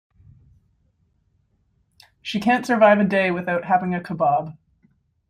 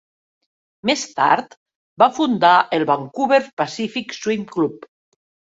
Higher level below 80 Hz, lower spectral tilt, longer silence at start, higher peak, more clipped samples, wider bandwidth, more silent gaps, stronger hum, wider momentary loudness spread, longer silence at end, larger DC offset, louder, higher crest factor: about the same, -62 dBFS vs -66 dBFS; first, -6.5 dB/octave vs -4 dB/octave; first, 2.25 s vs 0.85 s; about the same, -2 dBFS vs -2 dBFS; neither; first, 14.5 kHz vs 8 kHz; second, none vs 1.57-1.66 s, 1.76-1.96 s, 3.53-3.57 s; neither; about the same, 12 LU vs 11 LU; about the same, 0.75 s vs 0.8 s; neither; about the same, -20 LUFS vs -19 LUFS; about the same, 20 dB vs 18 dB